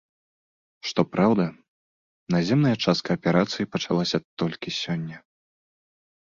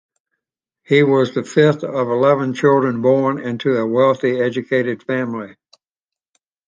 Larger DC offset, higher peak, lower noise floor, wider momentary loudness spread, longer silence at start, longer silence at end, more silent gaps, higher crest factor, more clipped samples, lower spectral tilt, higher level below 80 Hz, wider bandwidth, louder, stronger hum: neither; second, -6 dBFS vs -2 dBFS; about the same, under -90 dBFS vs -89 dBFS; about the same, 9 LU vs 7 LU; about the same, 0.85 s vs 0.9 s; about the same, 1.15 s vs 1.15 s; first, 1.68-2.26 s, 4.24-4.37 s vs none; about the same, 20 dB vs 16 dB; neither; about the same, -6 dB/octave vs -7 dB/octave; first, -60 dBFS vs -66 dBFS; second, 7.4 kHz vs 9 kHz; second, -24 LUFS vs -17 LUFS; neither